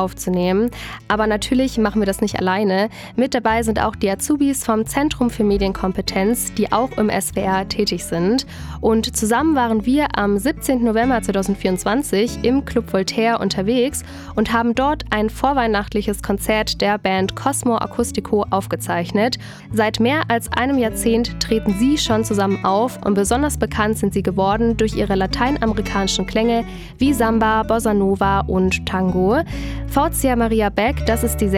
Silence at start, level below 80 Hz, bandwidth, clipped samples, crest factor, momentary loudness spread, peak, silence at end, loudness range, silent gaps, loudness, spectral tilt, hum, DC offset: 0 s; -34 dBFS; 17.5 kHz; under 0.1%; 14 dB; 4 LU; -4 dBFS; 0 s; 1 LU; none; -19 LUFS; -5 dB/octave; none; under 0.1%